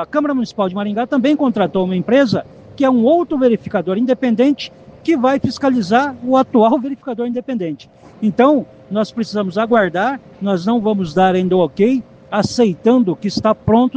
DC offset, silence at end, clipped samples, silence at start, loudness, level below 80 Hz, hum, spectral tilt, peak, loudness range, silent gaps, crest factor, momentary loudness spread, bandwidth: under 0.1%; 0.05 s; under 0.1%; 0 s; -16 LUFS; -52 dBFS; none; -7 dB/octave; 0 dBFS; 2 LU; none; 14 dB; 8 LU; 8.6 kHz